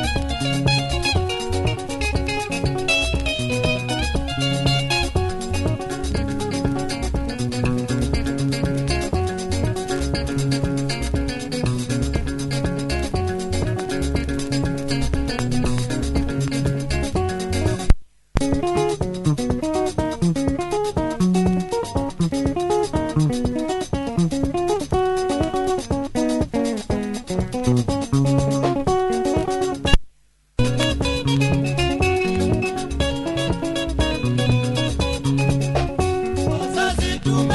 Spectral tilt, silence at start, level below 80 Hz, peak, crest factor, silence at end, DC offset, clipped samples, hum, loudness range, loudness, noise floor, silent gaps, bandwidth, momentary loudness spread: -5.5 dB/octave; 0 s; -30 dBFS; 0 dBFS; 20 dB; 0 s; under 0.1%; under 0.1%; none; 2 LU; -22 LUFS; -56 dBFS; none; 11.5 kHz; 5 LU